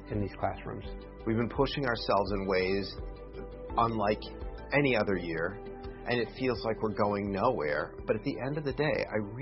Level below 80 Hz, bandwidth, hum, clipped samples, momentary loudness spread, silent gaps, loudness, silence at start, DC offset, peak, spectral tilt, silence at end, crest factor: -46 dBFS; 6 kHz; none; under 0.1%; 14 LU; none; -31 LUFS; 0 s; under 0.1%; -12 dBFS; -9.5 dB/octave; 0 s; 18 dB